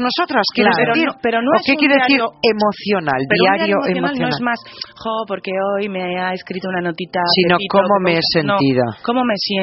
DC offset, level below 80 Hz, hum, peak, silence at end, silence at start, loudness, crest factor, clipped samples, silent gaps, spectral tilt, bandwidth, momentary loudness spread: under 0.1%; -56 dBFS; none; 0 dBFS; 0 s; 0 s; -16 LUFS; 16 dB; under 0.1%; none; -3 dB/octave; 6 kHz; 9 LU